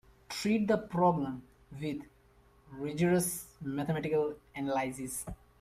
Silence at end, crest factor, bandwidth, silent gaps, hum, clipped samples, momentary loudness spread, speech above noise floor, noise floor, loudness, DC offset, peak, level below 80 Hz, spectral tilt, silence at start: 0.25 s; 18 dB; 15.5 kHz; none; none; under 0.1%; 14 LU; 31 dB; -63 dBFS; -33 LUFS; under 0.1%; -16 dBFS; -60 dBFS; -5.5 dB/octave; 0.3 s